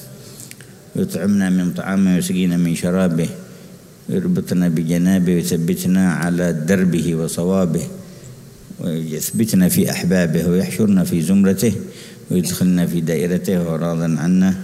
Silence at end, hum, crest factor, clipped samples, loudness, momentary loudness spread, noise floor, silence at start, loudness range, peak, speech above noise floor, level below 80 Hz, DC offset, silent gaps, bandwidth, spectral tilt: 0 s; none; 14 dB; under 0.1%; -18 LUFS; 18 LU; -40 dBFS; 0 s; 3 LU; -4 dBFS; 24 dB; -50 dBFS; under 0.1%; none; 16 kHz; -6.5 dB/octave